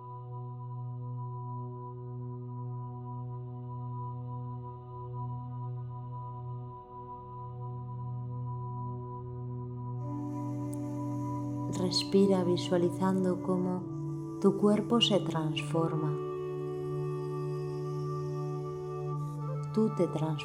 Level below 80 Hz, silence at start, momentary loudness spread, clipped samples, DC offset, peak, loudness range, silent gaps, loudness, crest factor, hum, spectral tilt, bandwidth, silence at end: -66 dBFS; 0 s; 15 LU; under 0.1%; under 0.1%; -12 dBFS; 11 LU; none; -34 LUFS; 20 dB; none; -6.5 dB/octave; 12.5 kHz; 0 s